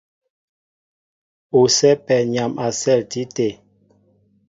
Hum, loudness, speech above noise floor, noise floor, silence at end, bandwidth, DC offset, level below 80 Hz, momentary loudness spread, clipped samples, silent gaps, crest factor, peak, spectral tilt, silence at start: 50 Hz at -55 dBFS; -18 LUFS; 41 dB; -59 dBFS; 0.95 s; 7.8 kHz; under 0.1%; -62 dBFS; 10 LU; under 0.1%; none; 18 dB; -2 dBFS; -4 dB/octave; 1.55 s